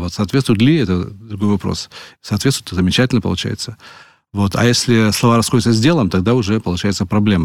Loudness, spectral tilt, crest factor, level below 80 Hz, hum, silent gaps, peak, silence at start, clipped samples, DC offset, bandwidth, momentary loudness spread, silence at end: -16 LUFS; -5.5 dB/octave; 14 dB; -40 dBFS; none; none; -2 dBFS; 0 s; under 0.1%; 0.2%; 16.5 kHz; 11 LU; 0 s